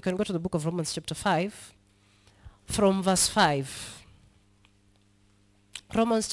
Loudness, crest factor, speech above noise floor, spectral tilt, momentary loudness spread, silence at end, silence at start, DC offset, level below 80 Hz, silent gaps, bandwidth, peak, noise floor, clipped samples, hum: -27 LUFS; 20 dB; 37 dB; -4 dB/octave; 20 LU; 0 s; 0.05 s; under 0.1%; -56 dBFS; none; 12 kHz; -8 dBFS; -63 dBFS; under 0.1%; none